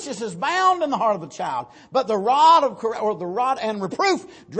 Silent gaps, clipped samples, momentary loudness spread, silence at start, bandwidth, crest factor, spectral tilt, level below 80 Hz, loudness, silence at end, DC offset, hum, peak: none; under 0.1%; 13 LU; 0 s; 8.8 kHz; 16 dB; -4 dB/octave; -68 dBFS; -21 LUFS; 0 s; under 0.1%; none; -4 dBFS